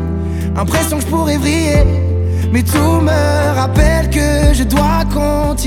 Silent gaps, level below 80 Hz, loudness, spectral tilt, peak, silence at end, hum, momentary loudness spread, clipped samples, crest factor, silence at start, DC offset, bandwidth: none; -18 dBFS; -14 LUFS; -6 dB/octave; 0 dBFS; 0 s; none; 4 LU; under 0.1%; 12 dB; 0 s; under 0.1%; 17 kHz